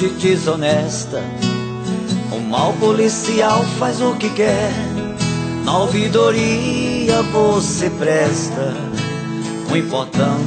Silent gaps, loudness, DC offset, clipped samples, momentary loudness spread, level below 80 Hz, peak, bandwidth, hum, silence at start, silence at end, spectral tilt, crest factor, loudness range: none; -17 LUFS; under 0.1%; under 0.1%; 8 LU; -44 dBFS; -2 dBFS; 9.2 kHz; none; 0 s; 0 s; -5 dB/octave; 16 dB; 2 LU